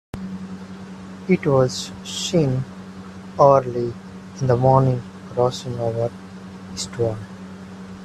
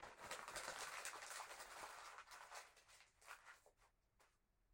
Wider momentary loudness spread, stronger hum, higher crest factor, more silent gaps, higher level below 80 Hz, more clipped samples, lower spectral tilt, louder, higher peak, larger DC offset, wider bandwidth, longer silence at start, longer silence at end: first, 21 LU vs 16 LU; neither; about the same, 22 dB vs 26 dB; neither; first, -52 dBFS vs -82 dBFS; neither; first, -6 dB/octave vs 0 dB/octave; first, -21 LUFS vs -54 LUFS; first, 0 dBFS vs -32 dBFS; neither; second, 12.5 kHz vs 16.5 kHz; first, 0.15 s vs 0 s; about the same, 0 s vs 0 s